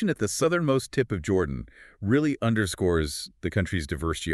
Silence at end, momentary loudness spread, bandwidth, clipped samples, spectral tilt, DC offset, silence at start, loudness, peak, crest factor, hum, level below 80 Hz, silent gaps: 0 s; 8 LU; 13.5 kHz; under 0.1%; -5.5 dB/octave; under 0.1%; 0 s; -26 LUFS; -10 dBFS; 16 dB; none; -42 dBFS; none